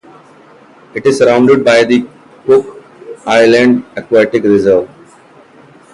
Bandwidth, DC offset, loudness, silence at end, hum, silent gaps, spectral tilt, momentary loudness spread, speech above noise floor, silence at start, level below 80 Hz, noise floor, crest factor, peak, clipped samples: 11.5 kHz; under 0.1%; -10 LUFS; 1.1 s; none; none; -5.5 dB/octave; 17 LU; 32 dB; 0.95 s; -50 dBFS; -41 dBFS; 12 dB; 0 dBFS; under 0.1%